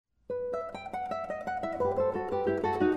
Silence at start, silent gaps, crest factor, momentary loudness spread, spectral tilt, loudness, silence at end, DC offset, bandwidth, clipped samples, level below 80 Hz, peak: 0.3 s; none; 16 dB; 8 LU; -7.5 dB/octave; -32 LUFS; 0 s; under 0.1%; 9.6 kHz; under 0.1%; -62 dBFS; -14 dBFS